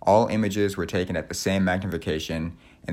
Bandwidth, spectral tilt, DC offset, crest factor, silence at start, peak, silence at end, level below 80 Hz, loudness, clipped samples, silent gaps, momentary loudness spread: 16 kHz; -5.5 dB/octave; under 0.1%; 18 dB; 0.05 s; -6 dBFS; 0 s; -50 dBFS; -25 LUFS; under 0.1%; none; 10 LU